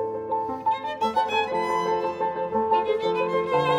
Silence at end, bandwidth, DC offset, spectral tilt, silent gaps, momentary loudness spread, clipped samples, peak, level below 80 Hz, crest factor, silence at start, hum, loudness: 0 s; 13 kHz; under 0.1%; -5.5 dB/octave; none; 4 LU; under 0.1%; -10 dBFS; -62 dBFS; 14 dB; 0 s; none; -25 LUFS